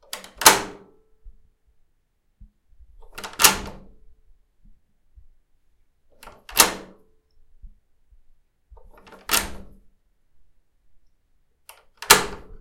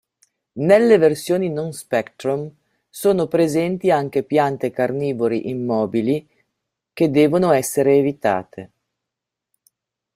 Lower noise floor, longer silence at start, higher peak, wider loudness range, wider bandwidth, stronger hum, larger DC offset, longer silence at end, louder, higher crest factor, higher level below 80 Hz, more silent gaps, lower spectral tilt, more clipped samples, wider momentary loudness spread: second, -67 dBFS vs -84 dBFS; second, 0.15 s vs 0.55 s; about the same, 0 dBFS vs -2 dBFS; first, 8 LU vs 2 LU; about the same, 16.5 kHz vs 16 kHz; neither; neither; second, 0.2 s vs 1.5 s; about the same, -18 LUFS vs -19 LUFS; first, 28 dB vs 18 dB; first, -48 dBFS vs -60 dBFS; neither; second, 0 dB/octave vs -6 dB/octave; neither; first, 25 LU vs 10 LU